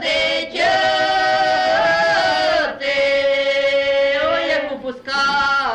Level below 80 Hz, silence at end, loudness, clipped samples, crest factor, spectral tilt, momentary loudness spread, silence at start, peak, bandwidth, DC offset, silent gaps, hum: -50 dBFS; 0 s; -17 LUFS; under 0.1%; 10 dB; -2.5 dB/octave; 4 LU; 0 s; -8 dBFS; 10 kHz; under 0.1%; none; none